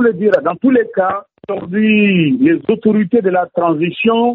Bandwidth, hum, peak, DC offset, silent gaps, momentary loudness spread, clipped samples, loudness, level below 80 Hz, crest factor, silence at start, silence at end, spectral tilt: 4.1 kHz; none; 0 dBFS; under 0.1%; none; 7 LU; under 0.1%; -14 LUFS; -56 dBFS; 12 dB; 0 s; 0 s; -5.5 dB/octave